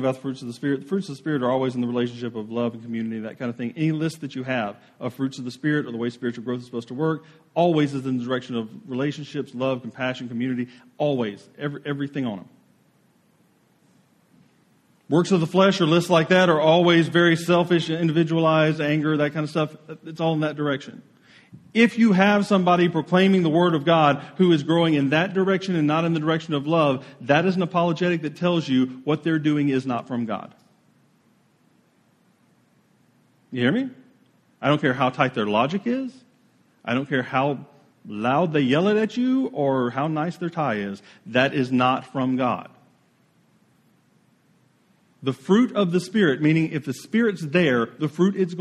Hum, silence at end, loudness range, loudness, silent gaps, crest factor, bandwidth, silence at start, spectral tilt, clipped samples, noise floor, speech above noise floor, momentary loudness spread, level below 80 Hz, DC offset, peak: none; 0 s; 11 LU; -22 LUFS; none; 22 dB; 13 kHz; 0 s; -6.5 dB/octave; under 0.1%; -62 dBFS; 40 dB; 12 LU; -68 dBFS; under 0.1%; -2 dBFS